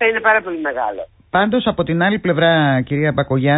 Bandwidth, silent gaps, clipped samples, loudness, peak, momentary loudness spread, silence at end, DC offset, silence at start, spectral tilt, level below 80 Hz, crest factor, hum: 4 kHz; none; under 0.1%; -17 LUFS; -4 dBFS; 9 LU; 0 s; under 0.1%; 0 s; -11.5 dB/octave; -46 dBFS; 14 dB; none